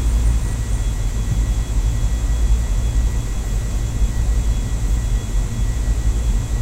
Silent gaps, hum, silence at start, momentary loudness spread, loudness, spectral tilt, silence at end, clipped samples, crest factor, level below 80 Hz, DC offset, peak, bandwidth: none; none; 0 s; 4 LU; -22 LUFS; -5.5 dB/octave; 0 s; under 0.1%; 12 dB; -18 dBFS; under 0.1%; -6 dBFS; 14 kHz